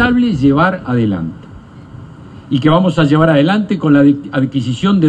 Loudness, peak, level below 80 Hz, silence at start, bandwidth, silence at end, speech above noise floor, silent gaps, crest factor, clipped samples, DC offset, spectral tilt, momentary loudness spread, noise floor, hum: -13 LUFS; 0 dBFS; -40 dBFS; 0 s; 8.8 kHz; 0 s; 23 dB; none; 12 dB; under 0.1%; under 0.1%; -8 dB/octave; 7 LU; -35 dBFS; none